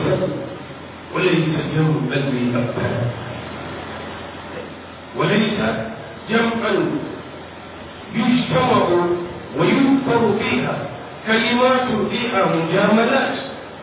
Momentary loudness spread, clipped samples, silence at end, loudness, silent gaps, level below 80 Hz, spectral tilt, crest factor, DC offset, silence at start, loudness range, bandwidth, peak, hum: 16 LU; under 0.1%; 0 s; -19 LUFS; none; -48 dBFS; -10.5 dB/octave; 16 dB; under 0.1%; 0 s; 6 LU; 4 kHz; -4 dBFS; none